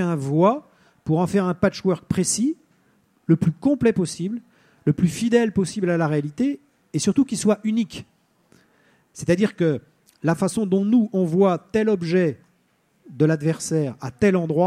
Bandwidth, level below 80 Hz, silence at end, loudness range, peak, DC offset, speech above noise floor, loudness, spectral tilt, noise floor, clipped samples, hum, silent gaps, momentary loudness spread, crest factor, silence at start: 14.5 kHz; -56 dBFS; 0 s; 3 LU; -4 dBFS; under 0.1%; 44 dB; -22 LUFS; -6 dB/octave; -64 dBFS; under 0.1%; none; none; 10 LU; 18 dB; 0 s